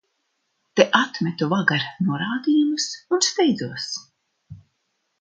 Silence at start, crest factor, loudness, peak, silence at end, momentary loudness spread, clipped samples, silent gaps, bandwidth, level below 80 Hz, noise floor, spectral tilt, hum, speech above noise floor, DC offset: 0.75 s; 22 dB; -21 LUFS; 0 dBFS; 0.65 s; 10 LU; under 0.1%; none; 9.6 kHz; -66 dBFS; -74 dBFS; -4 dB/octave; none; 52 dB; under 0.1%